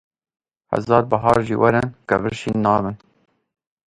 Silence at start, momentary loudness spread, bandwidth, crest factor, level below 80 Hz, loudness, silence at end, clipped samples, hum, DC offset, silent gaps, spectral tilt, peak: 0.7 s; 9 LU; 11.5 kHz; 20 dB; -48 dBFS; -19 LUFS; 0.9 s; under 0.1%; none; under 0.1%; none; -7.5 dB/octave; 0 dBFS